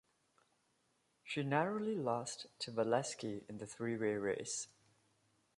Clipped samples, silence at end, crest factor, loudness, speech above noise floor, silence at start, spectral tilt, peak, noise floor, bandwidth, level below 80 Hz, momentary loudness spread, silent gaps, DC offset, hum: under 0.1%; 0.9 s; 22 dB; -39 LUFS; 40 dB; 1.25 s; -4.5 dB/octave; -18 dBFS; -79 dBFS; 11.5 kHz; -80 dBFS; 10 LU; none; under 0.1%; none